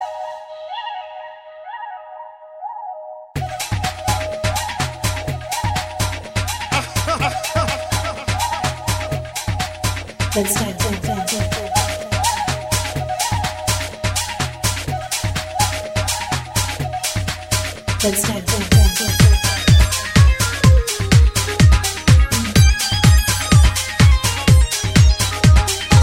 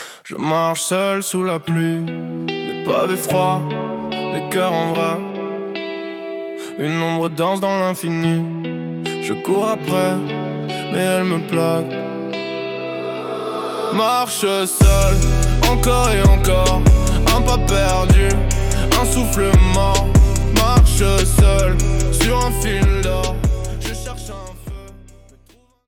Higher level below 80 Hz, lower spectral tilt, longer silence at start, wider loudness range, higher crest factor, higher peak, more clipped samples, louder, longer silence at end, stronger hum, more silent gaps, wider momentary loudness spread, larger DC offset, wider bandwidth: about the same, -22 dBFS vs -20 dBFS; about the same, -4 dB/octave vs -5 dB/octave; about the same, 0 s vs 0 s; about the same, 9 LU vs 7 LU; about the same, 16 dB vs 14 dB; about the same, 0 dBFS vs -2 dBFS; neither; about the same, -17 LUFS vs -18 LUFS; second, 0 s vs 0.9 s; neither; neither; first, 16 LU vs 12 LU; neither; about the same, 16.5 kHz vs 18 kHz